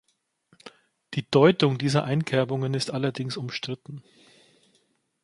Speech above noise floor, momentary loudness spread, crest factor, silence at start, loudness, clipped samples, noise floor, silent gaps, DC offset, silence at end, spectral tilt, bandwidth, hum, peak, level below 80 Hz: 44 dB; 15 LU; 22 dB; 0.65 s; -25 LUFS; under 0.1%; -69 dBFS; none; under 0.1%; 1.25 s; -6 dB/octave; 11.5 kHz; none; -4 dBFS; -66 dBFS